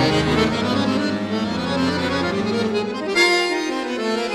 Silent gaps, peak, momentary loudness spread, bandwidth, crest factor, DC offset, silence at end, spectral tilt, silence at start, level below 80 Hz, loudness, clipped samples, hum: none; -4 dBFS; 7 LU; 15 kHz; 16 dB; under 0.1%; 0 s; -5 dB/octave; 0 s; -44 dBFS; -20 LUFS; under 0.1%; none